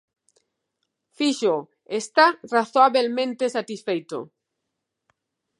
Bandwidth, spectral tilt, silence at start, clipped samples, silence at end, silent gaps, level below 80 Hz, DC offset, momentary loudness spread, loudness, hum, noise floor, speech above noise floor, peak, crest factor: 11.5 kHz; -3.5 dB/octave; 1.2 s; under 0.1%; 1.35 s; none; -82 dBFS; under 0.1%; 12 LU; -22 LUFS; none; -81 dBFS; 59 dB; -4 dBFS; 20 dB